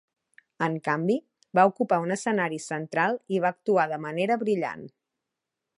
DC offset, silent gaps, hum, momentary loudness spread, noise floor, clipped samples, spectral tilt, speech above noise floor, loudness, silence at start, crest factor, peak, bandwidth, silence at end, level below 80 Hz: under 0.1%; none; none; 8 LU; -86 dBFS; under 0.1%; -6 dB/octave; 60 dB; -26 LUFS; 0.6 s; 22 dB; -6 dBFS; 11.5 kHz; 0.9 s; -78 dBFS